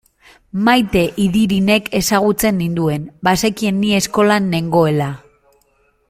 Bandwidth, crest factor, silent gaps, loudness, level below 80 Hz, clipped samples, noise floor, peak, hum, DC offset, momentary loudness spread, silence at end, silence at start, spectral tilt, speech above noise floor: 16 kHz; 16 dB; none; -15 LUFS; -42 dBFS; under 0.1%; -59 dBFS; -2 dBFS; none; under 0.1%; 6 LU; 0.9 s; 0.55 s; -5 dB/octave; 44 dB